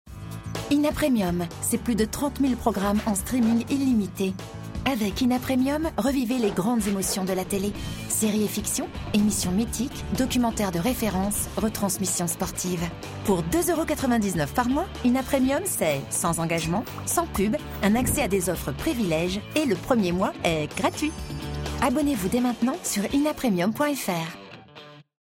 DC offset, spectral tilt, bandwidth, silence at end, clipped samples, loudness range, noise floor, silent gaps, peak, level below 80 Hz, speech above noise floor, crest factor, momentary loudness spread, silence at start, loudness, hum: under 0.1%; -4.5 dB/octave; 16.5 kHz; 0.2 s; under 0.1%; 1 LU; -47 dBFS; none; -6 dBFS; -42 dBFS; 22 dB; 18 dB; 6 LU; 0.05 s; -25 LUFS; none